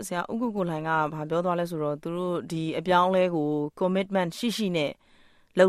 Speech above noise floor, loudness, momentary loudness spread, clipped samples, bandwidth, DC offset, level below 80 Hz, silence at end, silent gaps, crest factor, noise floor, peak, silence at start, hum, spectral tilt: 31 dB; -27 LUFS; 8 LU; under 0.1%; 15 kHz; under 0.1%; -64 dBFS; 0 s; none; 20 dB; -58 dBFS; -8 dBFS; 0 s; none; -6 dB/octave